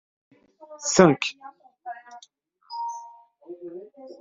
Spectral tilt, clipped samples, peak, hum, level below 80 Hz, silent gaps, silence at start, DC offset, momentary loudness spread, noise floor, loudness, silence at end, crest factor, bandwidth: -4.5 dB/octave; under 0.1%; -2 dBFS; none; -64 dBFS; none; 0.6 s; under 0.1%; 26 LU; -58 dBFS; -22 LUFS; 0.1 s; 26 dB; 7.8 kHz